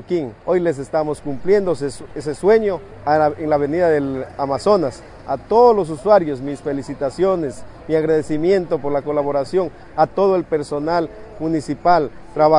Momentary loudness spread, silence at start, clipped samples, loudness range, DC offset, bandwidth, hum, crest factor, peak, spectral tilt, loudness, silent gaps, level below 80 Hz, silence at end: 10 LU; 0 s; under 0.1%; 2 LU; under 0.1%; 11 kHz; none; 18 dB; 0 dBFS; -7 dB/octave; -19 LUFS; none; -46 dBFS; 0 s